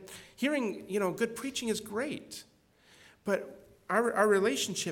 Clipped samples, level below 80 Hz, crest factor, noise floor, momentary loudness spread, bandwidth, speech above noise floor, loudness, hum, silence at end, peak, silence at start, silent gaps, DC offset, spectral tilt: under 0.1%; -72 dBFS; 20 dB; -63 dBFS; 20 LU; 17.5 kHz; 32 dB; -31 LUFS; none; 0 s; -14 dBFS; 0 s; none; under 0.1%; -3.5 dB/octave